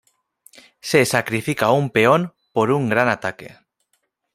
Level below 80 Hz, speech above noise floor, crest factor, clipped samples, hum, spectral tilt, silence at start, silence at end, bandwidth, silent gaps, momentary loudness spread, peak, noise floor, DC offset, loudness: -60 dBFS; 52 dB; 20 dB; under 0.1%; none; -5 dB/octave; 0.85 s; 0.85 s; 16 kHz; none; 10 LU; -2 dBFS; -70 dBFS; under 0.1%; -19 LUFS